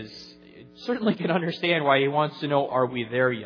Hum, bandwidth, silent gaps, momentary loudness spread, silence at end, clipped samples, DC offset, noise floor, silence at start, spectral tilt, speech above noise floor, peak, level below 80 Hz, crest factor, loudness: none; 5.4 kHz; none; 17 LU; 0 s; under 0.1%; under 0.1%; -48 dBFS; 0 s; -7 dB/octave; 24 dB; -6 dBFS; -68 dBFS; 20 dB; -24 LUFS